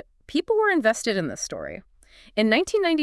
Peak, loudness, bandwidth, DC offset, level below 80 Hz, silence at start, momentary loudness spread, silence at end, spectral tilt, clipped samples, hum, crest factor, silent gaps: -6 dBFS; -23 LUFS; 12 kHz; under 0.1%; -56 dBFS; 0.3 s; 13 LU; 0 s; -3.5 dB/octave; under 0.1%; none; 18 dB; none